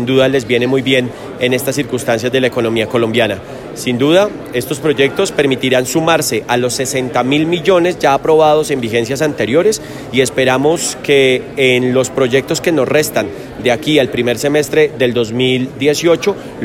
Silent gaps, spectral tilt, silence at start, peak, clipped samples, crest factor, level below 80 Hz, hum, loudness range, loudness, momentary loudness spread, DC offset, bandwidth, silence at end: none; -4.5 dB/octave; 0 s; 0 dBFS; under 0.1%; 14 dB; -46 dBFS; none; 2 LU; -13 LUFS; 6 LU; under 0.1%; 16.5 kHz; 0 s